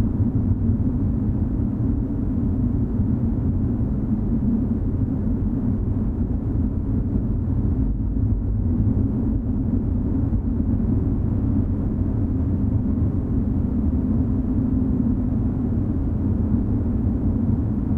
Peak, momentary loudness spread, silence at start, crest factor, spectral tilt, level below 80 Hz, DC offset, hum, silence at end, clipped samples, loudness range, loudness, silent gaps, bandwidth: -6 dBFS; 2 LU; 0 s; 14 dB; -13 dB/octave; -26 dBFS; under 0.1%; none; 0 s; under 0.1%; 1 LU; -23 LUFS; none; 2.5 kHz